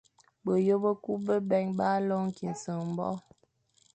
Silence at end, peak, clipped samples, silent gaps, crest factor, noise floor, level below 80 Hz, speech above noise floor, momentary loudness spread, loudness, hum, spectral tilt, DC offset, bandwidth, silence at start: 0.75 s; -16 dBFS; under 0.1%; none; 16 dB; -69 dBFS; -72 dBFS; 40 dB; 9 LU; -30 LUFS; none; -7.5 dB/octave; under 0.1%; 8.8 kHz; 0.45 s